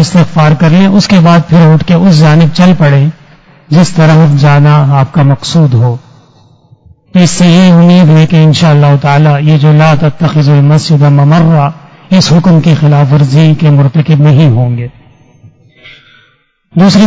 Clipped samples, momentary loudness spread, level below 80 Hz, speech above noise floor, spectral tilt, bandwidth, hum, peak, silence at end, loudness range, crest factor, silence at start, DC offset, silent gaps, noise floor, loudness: 5%; 5 LU; -38 dBFS; 45 dB; -7 dB/octave; 8 kHz; none; 0 dBFS; 0 s; 3 LU; 6 dB; 0 s; under 0.1%; none; -50 dBFS; -5 LUFS